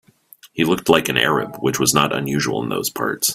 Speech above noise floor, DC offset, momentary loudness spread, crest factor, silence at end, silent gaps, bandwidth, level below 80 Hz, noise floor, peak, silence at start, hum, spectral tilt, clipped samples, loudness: 30 dB; under 0.1%; 7 LU; 20 dB; 0 s; none; 16 kHz; -54 dBFS; -49 dBFS; 0 dBFS; 0.45 s; none; -3.5 dB/octave; under 0.1%; -18 LUFS